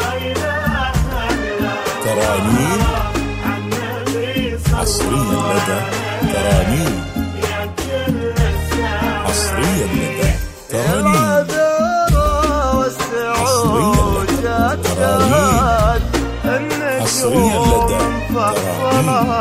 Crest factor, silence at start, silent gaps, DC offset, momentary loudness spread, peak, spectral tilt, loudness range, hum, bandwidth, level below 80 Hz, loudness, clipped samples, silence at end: 16 dB; 0 s; none; under 0.1%; 7 LU; 0 dBFS; -5 dB/octave; 3 LU; none; 16 kHz; -26 dBFS; -17 LUFS; under 0.1%; 0 s